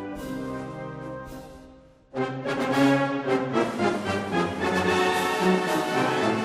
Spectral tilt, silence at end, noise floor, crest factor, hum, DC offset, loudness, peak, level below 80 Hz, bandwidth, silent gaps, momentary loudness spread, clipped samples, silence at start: -5.5 dB/octave; 0 s; -51 dBFS; 16 dB; none; under 0.1%; -25 LUFS; -10 dBFS; -56 dBFS; 15 kHz; none; 15 LU; under 0.1%; 0 s